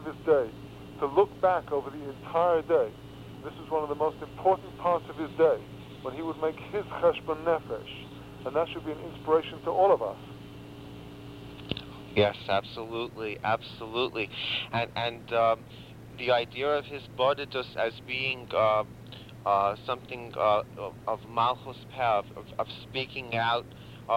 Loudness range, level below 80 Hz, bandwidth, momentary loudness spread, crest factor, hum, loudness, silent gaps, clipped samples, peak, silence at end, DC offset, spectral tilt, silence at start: 3 LU; -58 dBFS; 16 kHz; 18 LU; 20 dB; none; -29 LUFS; none; under 0.1%; -10 dBFS; 0 s; under 0.1%; -6 dB/octave; 0 s